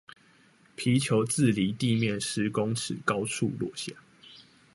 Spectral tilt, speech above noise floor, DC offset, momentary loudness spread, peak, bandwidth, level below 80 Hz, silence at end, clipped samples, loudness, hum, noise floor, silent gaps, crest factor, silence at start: -5 dB/octave; 33 dB; under 0.1%; 10 LU; -10 dBFS; 11.5 kHz; -62 dBFS; 0.35 s; under 0.1%; -28 LUFS; none; -60 dBFS; none; 18 dB; 0.1 s